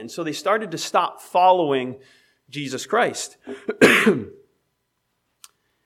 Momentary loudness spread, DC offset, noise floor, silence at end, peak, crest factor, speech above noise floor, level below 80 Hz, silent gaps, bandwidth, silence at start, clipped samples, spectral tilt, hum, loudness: 18 LU; under 0.1%; -74 dBFS; 1.55 s; 0 dBFS; 22 dB; 53 dB; -66 dBFS; none; 16.5 kHz; 0 s; under 0.1%; -4 dB/octave; none; -20 LUFS